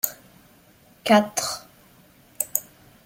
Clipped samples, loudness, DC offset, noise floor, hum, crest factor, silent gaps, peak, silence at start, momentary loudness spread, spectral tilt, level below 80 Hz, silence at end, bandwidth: under 0.1%; -24 LUFS; under 0.1%; -55 dBFS; none; 26 dB; none; 0 dBFS; 0.05 s; 13 LU; -3 dB/octave; -66 dBFS; 0.45 s; 17 kHz